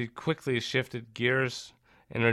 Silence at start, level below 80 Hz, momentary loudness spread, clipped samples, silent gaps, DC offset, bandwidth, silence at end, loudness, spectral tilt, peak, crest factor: 0 s; -66 dBFS; 12 LU; under 0.1%; none; under 0.1%; 14 kHz; 0 s; -30 LUFS; -5.5 dB/octave; -12 dBFS; 18 dB